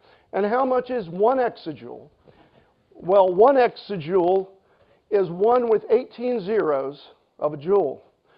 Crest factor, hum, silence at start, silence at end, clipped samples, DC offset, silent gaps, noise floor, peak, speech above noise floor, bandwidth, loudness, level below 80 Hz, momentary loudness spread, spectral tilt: 18 dB; none; 0.35 s; 0.4 s; under 0.1%; under 0.1%; none; -60 dBFS; -4 dBFS; 39 dB; 5.4 kHz; -21 LUFS; -66 dBFS; 17 LU; -10 dB/octave